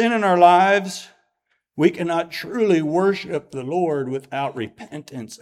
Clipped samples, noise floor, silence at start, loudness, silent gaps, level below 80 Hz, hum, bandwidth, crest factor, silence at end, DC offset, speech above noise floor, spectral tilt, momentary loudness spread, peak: under 0.1%; -72 dBFS; 0 s; -19 LUFS; none; -68 dBFS; none; 14.5 kHz; 20 dB; 0.05 s; under 0.1%; 52 dB; -5.5 dB/octave; 20 LU; 0 dBFS